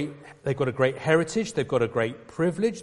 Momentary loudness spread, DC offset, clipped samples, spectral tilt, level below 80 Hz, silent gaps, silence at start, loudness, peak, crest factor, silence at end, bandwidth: 8 LU; under 0.1%; under 0.1%; -6 dB/octave; -58 dBFS; none; 0 s; -26 LUFS; -6 dBFS; 18 dB; 0 s; 11.5 kHz